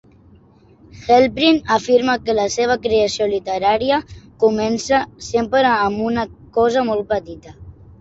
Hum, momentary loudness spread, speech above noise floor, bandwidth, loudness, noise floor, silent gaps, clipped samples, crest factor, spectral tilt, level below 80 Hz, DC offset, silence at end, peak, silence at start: none; 8 LU; 32 dB; 8 kHz; -17 LUFS; -49 dBFS; none; under 0.1%; 16 dB; -4 dB/octave; -46 dBFS; under 0.1%; 0.3 s; -2 dBFS; 0.95 s